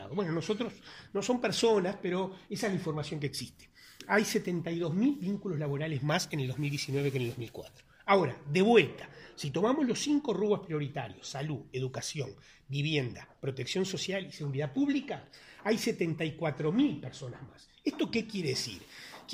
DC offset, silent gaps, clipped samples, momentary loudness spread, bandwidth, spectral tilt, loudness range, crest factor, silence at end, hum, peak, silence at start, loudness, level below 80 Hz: under 0.1%; none; under 0.1%; 14 LU; 15.5 kHz; -5.5 dB/octave; 5 LU; 22 dB; 0 s; none; -10 dBFS; 0 s; -32 LUFS; -66 dBFS